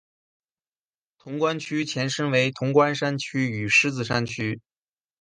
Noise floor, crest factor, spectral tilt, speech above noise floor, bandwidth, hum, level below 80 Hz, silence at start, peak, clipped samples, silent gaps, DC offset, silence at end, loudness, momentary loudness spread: under -90 dBFS; 20 dB; -5 dB/octave; over 66 dB; 10 kHz; none; -62 dBFS; 1.25 s; -6 dBFS; under 0.1%; none; under 0.1%; 0.6 s; -23 LUFS; 10 LU